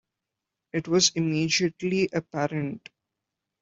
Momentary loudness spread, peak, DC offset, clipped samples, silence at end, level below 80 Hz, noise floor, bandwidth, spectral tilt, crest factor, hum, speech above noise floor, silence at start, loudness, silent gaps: 12 LU; -8 dBFS; under 0.1%; under 0.1%; 0.85 s; -66 dBFS; -86 dBFS; 8.2 kHz; -4 dB/octave; 20 dB; none; 60 dB; 0.75 s; -25 LUFS; none